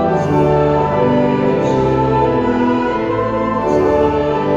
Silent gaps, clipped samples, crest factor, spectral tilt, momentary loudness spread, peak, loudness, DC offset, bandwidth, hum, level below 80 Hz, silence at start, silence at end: none; under 0.1%; 12 dB; -8 dB/octave; 4 LU; -2 dBFS; -15 LUFS; under 0.1%; 7.8 kHz; none; -34 dBFS; 0 s; 0 s